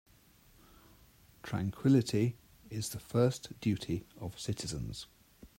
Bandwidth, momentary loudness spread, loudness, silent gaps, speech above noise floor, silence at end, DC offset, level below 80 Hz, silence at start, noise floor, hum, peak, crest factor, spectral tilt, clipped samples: 16 kHz; 17 LU; -34 LUFS; none; 30 dB; 0.15 s; under 0.1%; -60 dBFS; 1.45 s; -63 dBFS; none; -16 dBFS; 20 dB; -6 dB/octave; under 0.1%